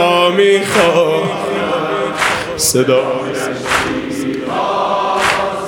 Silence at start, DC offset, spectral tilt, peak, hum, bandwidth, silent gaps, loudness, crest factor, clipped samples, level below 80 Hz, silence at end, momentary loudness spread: 0 s; under 0.1%; -3.5 dB/octave; 0 dBFS; none; 17.5 kHz; none; -14 LUFS; 14 dB; under 0.1%; -46 dBFS; 0 s; 8 LU